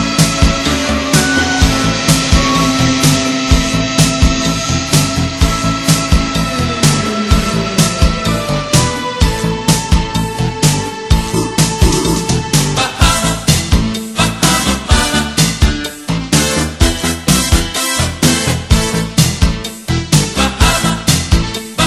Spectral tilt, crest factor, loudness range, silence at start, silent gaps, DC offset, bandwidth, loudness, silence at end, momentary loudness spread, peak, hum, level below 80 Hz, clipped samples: -4 dB/octave; 12 dB; 2 LU; 0 s; none; under 0.1%; 13.5 kHz; -13 LUFS; 0 s; 4 LU; 0 dBFS; none; -20 dBFS; 0.2%